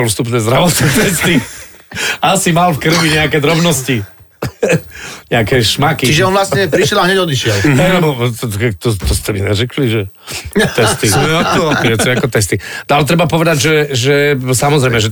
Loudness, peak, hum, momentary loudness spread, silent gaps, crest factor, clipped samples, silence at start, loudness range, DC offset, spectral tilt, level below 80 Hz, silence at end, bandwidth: -12 LUFS; -2 dBFS; none; 8 LU; none; 10 dB; under 0.1%; 0 s; 2 LU; under 0.1%; -4.5 dB/octave; -32 dBFS; 0 s; 19 kHz